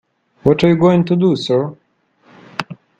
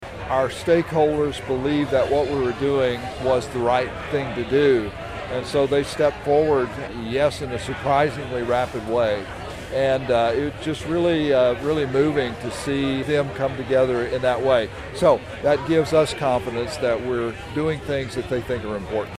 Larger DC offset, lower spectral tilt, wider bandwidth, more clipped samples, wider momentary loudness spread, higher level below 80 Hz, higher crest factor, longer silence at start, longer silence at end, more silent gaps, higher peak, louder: neither; first, -7.5 dB/octave vs -6 dB/octave; second, 7.8 kHz vs 14.5 kHz; neither; first, 15 LU vs 8 LU; about the same, -48 dBFS vs -44 dBFS; about the same, 16 dB vs 16 dB; first, 0.45 s vs 0 s; first, 0.25 s vs 0 s; neither; first, 0 dBFS vs -4 dBFS; first, -14 LUFS vs -22 LUFS